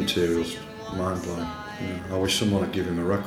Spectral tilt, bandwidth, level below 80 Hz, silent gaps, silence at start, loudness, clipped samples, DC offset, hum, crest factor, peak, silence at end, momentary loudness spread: -5 dB/octave; 17.5 kHz; -50 dBFS; none; 0 s; -27 LUFS; under 0.1%; under 0.1%; none; 16 dB; -12 dBFS; 0 s; 10 LU